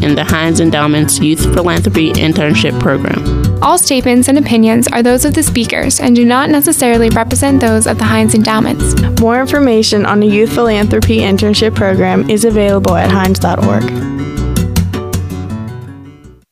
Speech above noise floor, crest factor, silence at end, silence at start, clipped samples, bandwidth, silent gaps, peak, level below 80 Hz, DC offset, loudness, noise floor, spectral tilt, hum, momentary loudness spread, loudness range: 26 dB; 10 dB; 0.2 s; 0 s; under 0.1%; 16 kHz; none; 0 dBFS; -26 dBFS; under 0.1%; -10 LUFS; -35 dBFS; -5 dB/octave; none; 6 LU; 3 LU